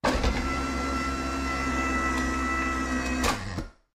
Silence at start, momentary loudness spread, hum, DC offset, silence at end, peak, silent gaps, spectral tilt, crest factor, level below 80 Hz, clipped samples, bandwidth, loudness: 0.05 s; 3 LU; none; under 0.1%; 0.25 s; -12 dBFS; none; -4.5 dB/octave; 16 dB; -34 dBFS; under 0.1%; 16 kHz; -28 LUFS